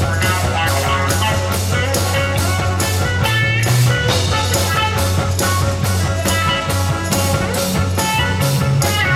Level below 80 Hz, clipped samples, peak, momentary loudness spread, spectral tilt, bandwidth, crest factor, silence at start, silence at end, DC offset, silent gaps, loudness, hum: -32 dBFS; under 0.1%; -2 dBFS; 3 LU; -4 dB/octave; 16.5 kHz; 14 dB; 0 s; 0 s; under 0.1%; none; -16 LUFS; none